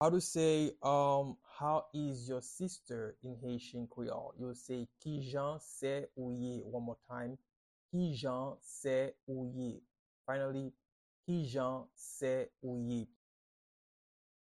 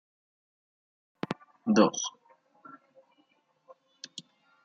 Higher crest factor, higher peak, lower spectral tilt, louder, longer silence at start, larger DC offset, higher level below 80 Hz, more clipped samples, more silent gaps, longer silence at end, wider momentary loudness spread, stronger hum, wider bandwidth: second, 20 dB vs 26 dB; second, -18 dBFS vs -8 dBFS; first, -6 dB/octave vs -4.5 dB/octave; second, -39 LUFS vs -29 LUFS; second, 0 s vs 1.3 s; neither; first, -72 dBFS vs -80 dBFS; neither; first, 7.56-7.89 s, 9.23-9.27 s, 9.99-10.25 s, 10.92-11.23 s vs none; first, 1.4 s vs 0.45 s; second, 13 LU vs 28 LU; neither; first, 12.5 kHz vs 8 kHz